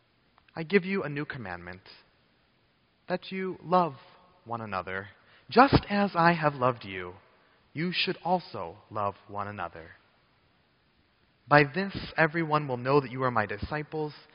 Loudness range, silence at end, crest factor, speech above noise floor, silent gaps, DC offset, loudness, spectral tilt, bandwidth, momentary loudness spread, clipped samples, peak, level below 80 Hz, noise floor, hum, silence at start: 7 LU; 0.15 s; 26 dB; 40 dB; none; under 0.1%; -28 LUFS; -4 dB/octave; 5.4 kHz; 17 LU; under 0.1%; -4 dBFS; -54 dBFS; -68 dBFS; none; 0.55 s